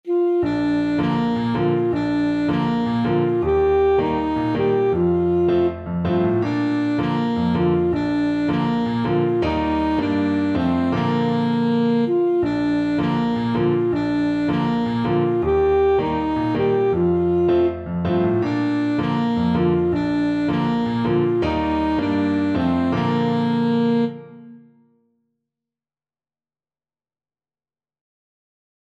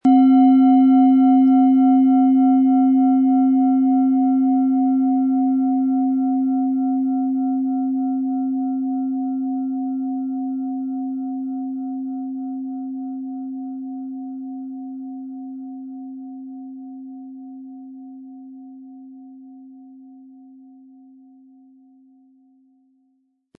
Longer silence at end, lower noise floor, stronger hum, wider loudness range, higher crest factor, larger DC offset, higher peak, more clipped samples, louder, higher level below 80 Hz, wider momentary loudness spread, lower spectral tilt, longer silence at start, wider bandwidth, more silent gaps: first, 4.35 s vs 3.45 s; first, under -90 dBFS vs -66 dBFS; neither; second, 2 LU vs 22 LU; about the same, 12 dB vs 14 dB; neither; about the same, -8 dBFS vs -6 dBFS; neither; about the same, -20 LUFS vs -18 LUFS; first, -42 dBFS vs -82 dBFS; second, 3 LU vs 23 LU; about the same, -8.5 dB/octave vs -9.5 dB/octave; about the same, 0.05 s vs 0.05 s; first, 7.8 kHz vs 3.2 kHz; neither